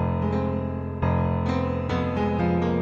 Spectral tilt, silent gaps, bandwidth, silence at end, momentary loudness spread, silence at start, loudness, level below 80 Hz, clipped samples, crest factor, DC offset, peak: -9 dB/octave; none; 7.2 kHz; 0 s; 4 LU; 0 s; -25 LUFS; -40 dBFS; under 0.1%; 14 dB; under 0.1%; -10 dBFS